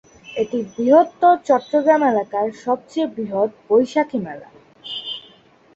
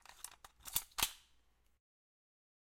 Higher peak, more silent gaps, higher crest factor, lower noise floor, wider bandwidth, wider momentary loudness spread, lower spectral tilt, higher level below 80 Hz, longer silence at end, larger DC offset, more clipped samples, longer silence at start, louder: first, -2 dBFS vs -16 dBFS; neither; second, 18 dB vs 32 dB; second, -51 dBFS vs -72 dBFS; second, 8 kHz vs 16.5 kHz; about the same, 16 LU vs 16 LU; first, -5.5 dB/octave vs 0.5 dB/octave; about the same, -64 dBFS vs -66 dBFS; second, 0.55 s vs 1.6 s; neither; neither; first, 0.25 s vs 0.1 s; first, -19 LUFS vs -39 LUFS